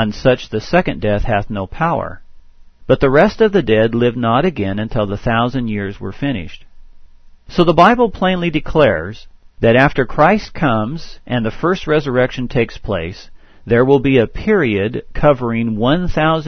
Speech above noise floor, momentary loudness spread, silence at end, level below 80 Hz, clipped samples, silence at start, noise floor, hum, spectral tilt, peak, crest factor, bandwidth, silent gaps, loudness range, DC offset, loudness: 25 dB; 11 LU; 0 s; -32 dBFS; under 0.1%; 0 s; -40 dBFS; none; -7.5 dB/octave; 0 dBFS; 16 dB; 6.6 kHz; none; 4 LU; 0.3%; -15 LUFS